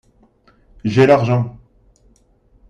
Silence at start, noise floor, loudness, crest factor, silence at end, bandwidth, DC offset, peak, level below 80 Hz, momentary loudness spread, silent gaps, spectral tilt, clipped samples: 0.85 s; -55 dBFS; -16 LUFS; 18 dB; 1.2 s; 7.8 kHz; under 0.1%; -2 dBFS; -50 dBFS; 14 LU; none; -8 dB/octave; under 0.1%